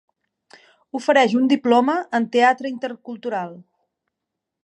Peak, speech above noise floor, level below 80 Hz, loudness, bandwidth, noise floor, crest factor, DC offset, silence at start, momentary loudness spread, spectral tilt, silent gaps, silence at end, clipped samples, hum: -4 dBFS; 63 dB; -78 dBFS; -19 LUFS; 10 kHz; -82 dBFS; 18 dB; under 0.1%; 0.95 s; 14 LU; -5 dB/octave; none; 1 s; under 0.1%; none